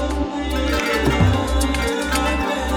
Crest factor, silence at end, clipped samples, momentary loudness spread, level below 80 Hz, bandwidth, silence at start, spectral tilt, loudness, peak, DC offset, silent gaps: 14 dB; 0 s; under 0.1%; 6 LU; -26 dBFS; 19.5 kHz; 0 s; -5 dB/octave; -20 LUFS; -4 dBFS; under 0.1%; none